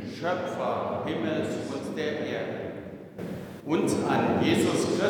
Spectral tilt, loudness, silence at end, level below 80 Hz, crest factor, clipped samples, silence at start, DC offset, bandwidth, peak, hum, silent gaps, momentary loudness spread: -5.5 dB/octave; -28 LUFS; 0 s; -62 dBFS; 16 dB; under 0.1%; 0 s; under 0.1%; 19 kHz; -12 dBFS; none; none; 14 LU